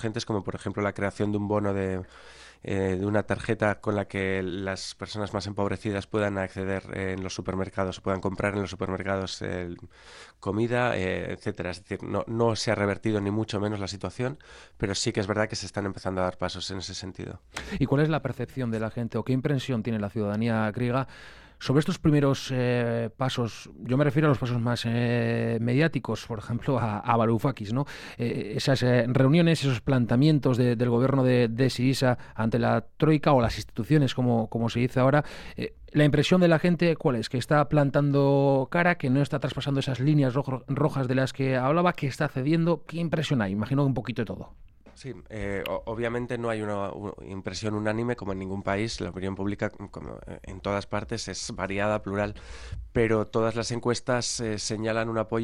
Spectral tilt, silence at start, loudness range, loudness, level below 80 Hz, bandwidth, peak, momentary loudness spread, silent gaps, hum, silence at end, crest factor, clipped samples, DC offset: -6.5 dB/octave; 0 s; 7 LU; -27 LUFS; -52 dBFS; 13.5 kHz; -6 dBFS; 11 LU; none; none; 0 s; 20 dB; under 0.1%; under 0.1%